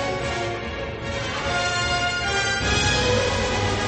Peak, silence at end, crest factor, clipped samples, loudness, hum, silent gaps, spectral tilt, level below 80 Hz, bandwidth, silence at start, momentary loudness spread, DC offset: -8 dBFS; 0 s; 16 dB; under 0.1%; -23 LUFS; none; none; -3.5 dB/octave; -36 dBFS; 8.8 kHz; 0 s; 9 LU; under 0.1%